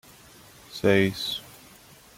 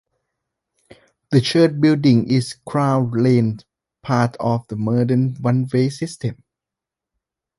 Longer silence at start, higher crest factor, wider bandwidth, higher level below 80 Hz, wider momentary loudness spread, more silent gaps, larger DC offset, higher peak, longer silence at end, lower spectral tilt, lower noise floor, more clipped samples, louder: second, 0.7 s vs 1.3 s; about the same, 20 dB vs 18 dB; first, 16.5 kHz vs 11.5 kHz; about the same, -60 dBFS vs -56 dBFS; first, 20 LU vs 11 LU; neither; neither; second, -8 dBFS vs -2 dBFS; second, 0.7 s vs 1.25 s; second, -5 dB/octave vs -7 dB/octave; second, -52 dBFS vs -86 dBFS; neither; second, -25 LUFS vs -19 LUFS